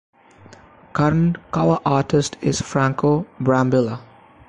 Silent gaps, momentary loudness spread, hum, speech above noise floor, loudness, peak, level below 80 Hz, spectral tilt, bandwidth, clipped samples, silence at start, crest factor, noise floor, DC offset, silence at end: none; 5 LU; none; 28 dB; -20 LUFS; -6 dBFS; -48 dBFS; -6.5 dB/octave; 10.5 kHz; under 0.1%; 0.95 s; 14 dB; -46 dBFS; under 0.1%; 0.45 s